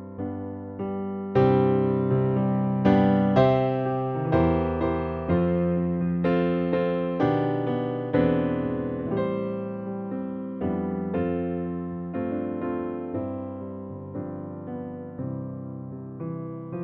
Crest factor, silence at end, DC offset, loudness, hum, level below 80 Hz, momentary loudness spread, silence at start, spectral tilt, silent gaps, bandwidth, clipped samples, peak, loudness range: 20 dB; 0 s; under 0.1%; -26 LUFS; none; -48 dBFS; 15 LU; 0 s; -10.5 dB/octave; none; 5.4 kHz; under 0.1%; -6 dBFS; 11 LU